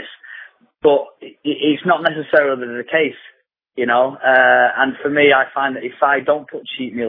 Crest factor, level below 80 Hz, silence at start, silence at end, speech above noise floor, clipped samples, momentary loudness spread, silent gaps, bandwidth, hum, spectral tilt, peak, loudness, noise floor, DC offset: 16 dB; -66 dBFS; 0 s; 0 s; 24 dB; under 0.1%; 16 LU; none; 5 kHz; none; -8 dB/octave; 0 dBFS; -16 LUFS; -40 dBFS; under 0.1%